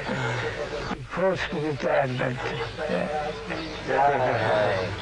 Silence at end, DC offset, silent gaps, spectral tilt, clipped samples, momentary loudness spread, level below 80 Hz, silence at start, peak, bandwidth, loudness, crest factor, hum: 0 s; under 0.1%; none; -6 dB/octave; under 0.1%; 9 LU; -48 dBFS; 0 s; -10 dBFS; 11 kHz; -26 LUFS; 16 dB; none